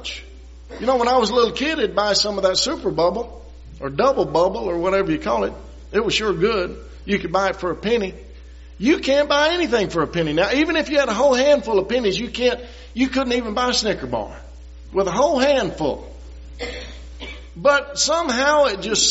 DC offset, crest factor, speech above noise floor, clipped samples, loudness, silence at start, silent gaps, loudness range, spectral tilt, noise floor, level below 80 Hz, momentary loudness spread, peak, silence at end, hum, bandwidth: under 0.1%; 16 dB; 20 dB; under 0.1%; -19 LUFS; 0 s; none; 4 LU; -2.5 dB/octave; -40 dBFS; -40 dBFS; 15 LU; -4 dBFS; 0 s; none; 8 kHz